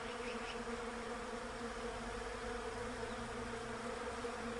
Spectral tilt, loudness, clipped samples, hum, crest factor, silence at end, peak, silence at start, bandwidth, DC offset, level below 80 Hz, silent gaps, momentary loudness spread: -4 dB/octave; -44 LUFS; under 0.1%; none; 12 dB; 0 s; -32 dBFS; 0 s; 11.5 kHz; under 0.1%; -56 dBFS; none; 1 LU